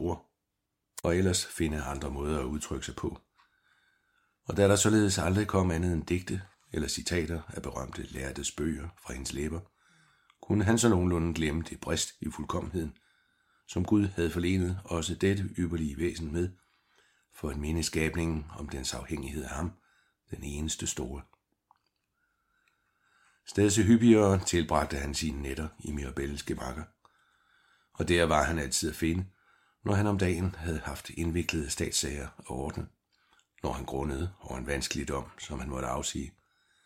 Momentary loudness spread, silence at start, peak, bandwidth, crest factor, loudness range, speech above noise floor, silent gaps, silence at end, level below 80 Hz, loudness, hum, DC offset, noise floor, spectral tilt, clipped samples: 14 LU; 0 s; -8 dBFS; 16 kHz; 24 dB; 9 LU; 53 dB; none; 0.55 s; -46 dBFS; -31 LUFS; none; under 0.1%; -83 dBFS; -5 dB/octave; under 0.1%